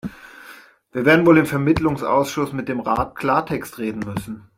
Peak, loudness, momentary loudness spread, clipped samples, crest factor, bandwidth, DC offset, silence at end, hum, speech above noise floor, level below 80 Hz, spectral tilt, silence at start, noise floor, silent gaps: -2 dBFS; -19 LUFS; 15 LU; under 0.1%; 18 dB; 16 kHz; under 0.1%; 0.2 s; none; 26 dB; -46 dBFS; -6.5 dB/octave; 0.05 s; -45 dBFS; none